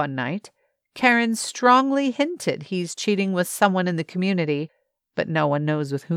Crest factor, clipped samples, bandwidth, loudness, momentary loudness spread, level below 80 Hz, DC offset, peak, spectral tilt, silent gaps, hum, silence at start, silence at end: 18 dB; under 0.1%; 16 kHz; -22 LUFS; 11 LU; -76 dBFS; under 0.1%; -4 dBFS; -5 dB/octave; none; none; 0 s; 0 s